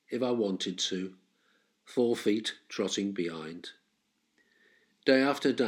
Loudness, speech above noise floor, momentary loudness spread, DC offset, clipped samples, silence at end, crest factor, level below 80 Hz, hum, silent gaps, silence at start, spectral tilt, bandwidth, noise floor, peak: -30 LUFS; 46 dB; 16 LU; under 0.1%; under 0.1%; 0 s; 20 dB; -84 dBFS; none; none; 0.1 s; -4 dB/octave; 16 kHz; -76 dBFS; -12 dBFS